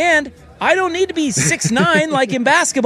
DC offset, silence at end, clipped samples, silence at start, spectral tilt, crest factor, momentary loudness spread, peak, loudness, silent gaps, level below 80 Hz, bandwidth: under 0.1%; 0 s; under 0.1%; 0 s; -3.5 dB/octave; 14 dB; 4 LU; -2 dBFS; -15 LUFS; none; -50 dBFS; 15 kHz